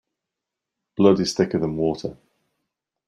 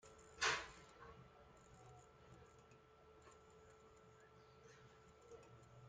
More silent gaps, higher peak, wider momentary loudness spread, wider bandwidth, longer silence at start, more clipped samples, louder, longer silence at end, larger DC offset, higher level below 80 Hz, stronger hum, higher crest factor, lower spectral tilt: neither; first, -4 dBFS vs -26 dBFS; second, 16 LU vs 25 LU; first, 11.5 kHz vs 9.4 kHz; first, 1 s vs 0 s; neither; first, -21 LUFS vs -45 LUFS; first, 0.95 s vs 0 s; neither; first, -56 dBFS vs -76 dBFS; neither; second, 20 dB vs 28 dB; first, -6 dB/octave vs -1.5 dB/octave